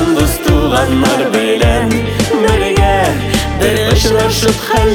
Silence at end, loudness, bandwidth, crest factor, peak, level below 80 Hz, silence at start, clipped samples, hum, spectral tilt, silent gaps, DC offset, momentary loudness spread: 0 s; -12 LUFS; 19.5 kHz; 10 dB; 0 dBFS; -20 dBFS; 0 s; under 0.1%; none; -5 dB/octave; none; under 0.1%; 3 LU